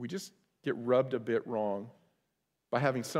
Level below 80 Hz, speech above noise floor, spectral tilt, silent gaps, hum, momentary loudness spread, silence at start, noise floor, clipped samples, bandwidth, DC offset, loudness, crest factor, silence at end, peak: -80 dBFS; 50 dB; -6 dB/octave; none; none; 12 LU; 0 s; -82 dBFS; under 0.1%; 16 kHz; under 0.1%; -33 LUFS; 20 dB; 0 s; -14 dBFS